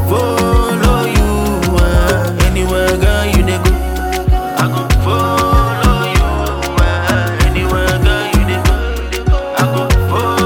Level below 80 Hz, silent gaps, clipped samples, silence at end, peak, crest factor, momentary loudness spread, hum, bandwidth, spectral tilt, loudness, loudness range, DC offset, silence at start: -16 dBFS; none; under 0.1%; 0 s; 0 dBFS; 12 dB; 4 LU; none; 18 kHz; -5.5 dB/octave; -13 LUFS; 1 LU; under 0.1%; 0 s